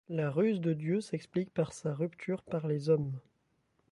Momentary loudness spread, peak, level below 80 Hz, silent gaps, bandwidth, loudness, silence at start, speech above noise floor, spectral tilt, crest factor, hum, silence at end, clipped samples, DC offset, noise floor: 6 LU; -16 dBFS; -70 dBFS; none; 11.5 kHz; -33 LUFS; 0.1 s; 42 dB; -7.5 dB/octave; 18 dB; none; 0.7 s; under 0.1%; under 0.1%; -75 dBFS